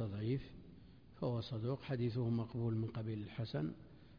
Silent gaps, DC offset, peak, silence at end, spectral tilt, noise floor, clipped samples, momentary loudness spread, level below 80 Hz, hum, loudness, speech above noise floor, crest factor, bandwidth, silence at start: none; under 0.1%; -28 dBFS; 0 s; -8 dB/octave; -60 dBFS; under 0.1%; 17 LU; -64 dBFS; none; -41 LUFS; 20 dB; 12 dB; 5.2 kHz; 0 s